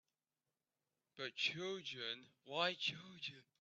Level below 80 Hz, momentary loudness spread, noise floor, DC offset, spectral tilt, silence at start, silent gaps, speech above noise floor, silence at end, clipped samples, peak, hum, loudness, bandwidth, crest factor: -88 dBFS; 11 LU; under -90 dBFS; under 0.1%; -3 dB/octave; 1.15 s; none; over 45 dB; 0.2 s; under 0.1%; -22 dBFS; none; -43 LUFS; 8.4 kHz; 24 dB